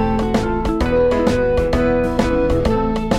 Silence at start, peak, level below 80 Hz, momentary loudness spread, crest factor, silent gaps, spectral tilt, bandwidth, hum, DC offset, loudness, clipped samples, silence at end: 0 s; -2 dBFS; -26 dBFS; 3 LU; 14 dB; none; -7 dB/octave; 13 kHz; none; under 0.1%; -17 LUFS; under 0.1%; 0 s